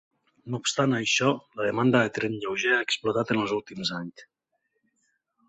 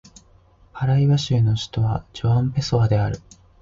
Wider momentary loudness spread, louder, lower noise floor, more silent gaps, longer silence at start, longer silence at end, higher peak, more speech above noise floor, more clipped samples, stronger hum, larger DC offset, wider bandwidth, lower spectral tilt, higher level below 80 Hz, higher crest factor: about the same, 8 LU vs 7 LU; second, -26 LUFS vs -21 LUFS; first, -77 dBFS vs -53 dBFS; neither; second, 0.45 s vs 0.75 s; first, 1.25 s vs 0.45 s; about the same, -8 dBFS vs -8 dBFS; first, 51 dB vs 34 dB; neither; neither; neither; about the same, 8.2 kHz vs 7.6 kHz; second, -4 dB/octave vs -7 dB/octave; second, -66 dBFS vs -42 dBFS; first, 20 dB vs 14 dB